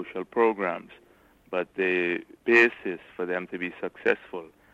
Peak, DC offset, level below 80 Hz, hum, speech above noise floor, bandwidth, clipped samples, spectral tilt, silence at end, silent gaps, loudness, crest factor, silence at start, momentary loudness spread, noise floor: -6 dBFS; under 0.1%; -70 dBFS; none; 26 dB; 7.8 kHz; under 0.1%; -6 dB/octave; 0.25 s; none; -26 LUFS; 22 dB; 0 s; 16 LU; -53 dBFS